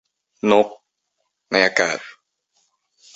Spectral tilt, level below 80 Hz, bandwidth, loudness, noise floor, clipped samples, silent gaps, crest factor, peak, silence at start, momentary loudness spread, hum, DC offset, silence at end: -3.5 dB/octave; -66 dBFS; 8.2 kHz; -19 LUFS; -75 dBFS; under 0.1%; none; 22 dB; -2 dBFS; 0.45 s; 11 LU; none; under 0.1%; 1.05 s